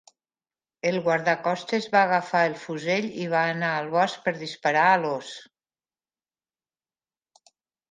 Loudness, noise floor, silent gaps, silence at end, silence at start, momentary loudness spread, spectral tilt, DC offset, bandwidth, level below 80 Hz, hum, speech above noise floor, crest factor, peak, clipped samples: -24 LUFS; under -90 dBFS; none; 2.45 s; 0.85 s; 9 LU; -5 dB/octave; under 0.1%; 9.6 kHz; -76 dBFS; none; over 66 dB; 20 dB; -8 dBFS; under 0.1%